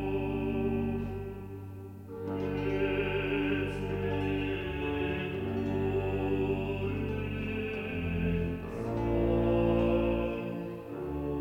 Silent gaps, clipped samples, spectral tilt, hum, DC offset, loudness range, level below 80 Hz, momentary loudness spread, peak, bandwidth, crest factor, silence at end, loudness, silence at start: none; under 0.1%; -8.5 dB/octave; none; under 0.1%; 3 LU; -44 dBFS; 11 LU; -16 dBFS; 16.5 kHz; 14 dB; 0 s; -32 LUFS; 0 s